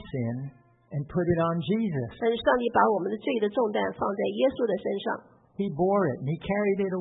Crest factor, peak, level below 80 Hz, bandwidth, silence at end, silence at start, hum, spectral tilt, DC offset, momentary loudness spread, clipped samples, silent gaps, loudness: 20 dB; -8 dBFS; -58 dBFS; 4 kHz; 0 s; 0 s; none; -11 dB/octave; under 0.1%; 10 LU; under 0.1%; none; -27 LUFS